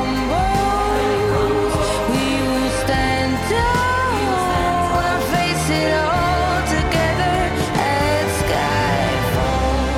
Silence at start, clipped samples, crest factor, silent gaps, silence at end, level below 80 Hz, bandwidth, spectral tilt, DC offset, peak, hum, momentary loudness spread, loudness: 0 s; under 0.1%; 10 dB; none; 0 s; -30 dBFS; 17 kHz; -5 dB/octave; under 0.1%; -8 dBFS; none; 2 LU; -18 LUFS